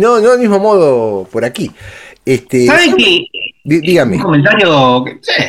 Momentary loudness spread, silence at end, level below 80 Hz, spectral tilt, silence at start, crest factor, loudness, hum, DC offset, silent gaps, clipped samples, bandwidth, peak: 11 LU; 0 s; -46 dBFS; -5 dB/octave; 0 s; 10 dB; -10 LUFS; none; under 0.1%; none; under 0.1%; 15.5 kHz; 0 dBFS